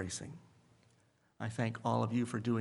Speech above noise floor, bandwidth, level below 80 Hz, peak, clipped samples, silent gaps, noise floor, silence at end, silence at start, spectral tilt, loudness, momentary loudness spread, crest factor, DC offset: 36 dB; 11.5 kHz; -74 dBFS; -18 dBFS; under 0.1%; none; -71 dBFS; 0 s; 0 s; -6 dB/octave; -37 LUFS; 14 LU; 20 dB; under 0.1%